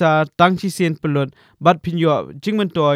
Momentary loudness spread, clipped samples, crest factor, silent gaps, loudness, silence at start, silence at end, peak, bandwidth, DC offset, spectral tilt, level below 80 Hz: 6 LU; under 0.1%; 18 dB; none; -18 LUFS; 0 s; 0 s; 0 dBFS; 15.5 kHz; under 0.1%; -6.5 dB/octave; -56 dBFS